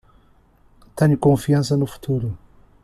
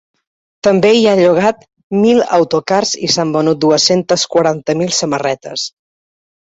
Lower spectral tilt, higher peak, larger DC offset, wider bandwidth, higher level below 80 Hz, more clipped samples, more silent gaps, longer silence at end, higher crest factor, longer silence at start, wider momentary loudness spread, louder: first, -7.5 dB/octave vs -4 dB/octave; second, -4 dBFS vs 0 dBFS; neither; first, 14 kHz vs 8.2 kHz; first, -48 dBFS vs -54 dBFS; neither; second, none vs 1.83-1.90 s; second, 0.5 s vs 0.8 s; about the same, 16 dB vs 14 dB; first, 0.95 s vs 0.65 s; first, 16 LU vs 10 LU; second, -20 LUFS vs -13 LUFS